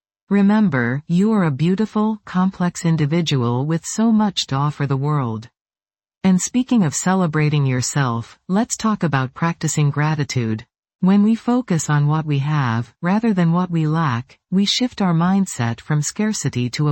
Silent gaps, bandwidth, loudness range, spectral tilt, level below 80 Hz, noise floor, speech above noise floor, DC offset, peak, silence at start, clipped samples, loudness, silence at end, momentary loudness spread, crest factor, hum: 5.61-5.65 s, 10.79-10.83 s, 10.95-10.99 s; 17 kHz; 2 LU; -5.5 dB/octave; -56 dBFS; under -90 dBFS; over 72 dB; under 0.1%; -4 dBFS; 0.3 s; under 0.1%; -19 LUFS; 0 s; 6 LU; 16 dB; none